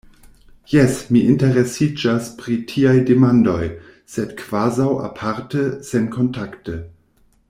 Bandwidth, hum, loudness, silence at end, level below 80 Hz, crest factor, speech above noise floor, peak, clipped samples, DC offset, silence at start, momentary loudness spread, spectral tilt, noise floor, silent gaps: 15.5 kHz; none; -18 LUFS; 0.6 s; -48 dBFS; 16 dB; 40 dB; -2 dBFS; under 0.1%; under 0.1%; 0.7 s; 15 LU; -7 dB/octave; -57 dBFS; none